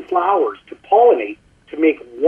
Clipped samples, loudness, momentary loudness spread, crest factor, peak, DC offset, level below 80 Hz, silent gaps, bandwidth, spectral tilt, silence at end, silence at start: under 0.1%; -16 LUFS; 18 LU; 14 dB; -2 dBFS; under 0.1%; -60 dBFS; none; 3.5 kHz; -6.5 dB/octave; 0 s; 0 s